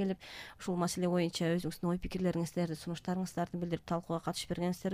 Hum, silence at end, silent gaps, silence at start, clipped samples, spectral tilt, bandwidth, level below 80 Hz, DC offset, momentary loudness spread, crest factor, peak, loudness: none; 0 s; none; 0 s; under 0.1%; -6 dB/octave; 15.5 kHz; -56 dBFS; under 0.1%; 6 LU; 14 dB; -20 dBFS; -36 LUFS